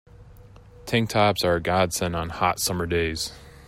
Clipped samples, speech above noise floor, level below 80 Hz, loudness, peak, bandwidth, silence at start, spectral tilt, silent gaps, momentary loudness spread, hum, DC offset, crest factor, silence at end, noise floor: under 0.1%; 24 dB; -46 dBFS; -24 LUFS; -6 dBFS; 16 kHz; 0.2 s; -4 dB/octave; none; 8 LU; none; under 0.1%; 18 dB; 0 s; -47 dBFS